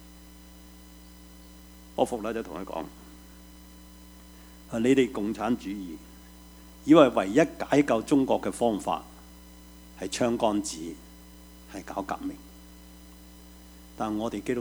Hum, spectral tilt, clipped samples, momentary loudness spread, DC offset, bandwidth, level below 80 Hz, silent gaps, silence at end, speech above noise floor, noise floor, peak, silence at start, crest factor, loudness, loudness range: 60 Hz at -50 dBFS; -5.5 dB/octave; under 0.1%; 26 LU; under 0.1%; over 20 kHz; -52 dBFS; none; 0 s; 23 dB; -49 dBFS; -4 dBFS; 0 s; 24 dB; -27 LUFS; 12 LU